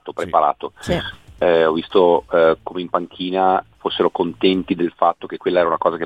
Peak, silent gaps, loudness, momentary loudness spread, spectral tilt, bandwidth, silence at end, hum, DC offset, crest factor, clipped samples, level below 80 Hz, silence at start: -2 dBFS; none; -18 LUFS; 8 LU; -6.5 dB/octave; 11.5 kHz; 0 s; none; 0.1%; 18 dB; under 0.1%; -48 dBFS; 0.05 s